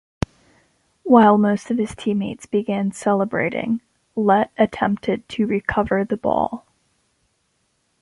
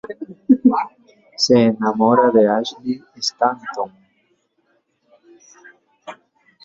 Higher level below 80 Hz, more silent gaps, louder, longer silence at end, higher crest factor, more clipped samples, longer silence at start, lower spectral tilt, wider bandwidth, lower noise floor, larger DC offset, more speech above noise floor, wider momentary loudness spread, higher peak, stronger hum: first, -48 dBFS vs -62 dBFS; neither; second, -20 LUFS vs -17 LUFS; first, 1.45 s vs 0.5 s; about the same, 18 dB vs 18 dB; neither; first, 1.05 s vs 0.1 s; first, -7 dB/octave vs -5 dB/octave; first, 11.5 kHz vs 7.6 kHz; about the same, -68 dBFS vs -65 dBFS; neither; about the same, 49 dB vs 48 dB; second, 12 LU vs 19 LU; about the same, -2 dBFS vs -2 dBFS; neither